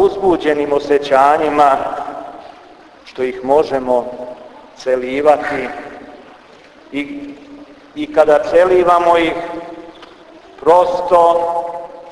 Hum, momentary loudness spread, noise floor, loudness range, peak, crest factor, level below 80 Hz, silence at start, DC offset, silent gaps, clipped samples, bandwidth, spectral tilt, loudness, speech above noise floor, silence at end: none; 21 LU; -42 dBFS; 6 LU; 0 dBFS; 16 dB; -48 dBFS; 0 s; under 0.1%; none; under 0.1%; 11 kHz; -5.5 dB/octave; -14 LUFS; 29 dB; 0 s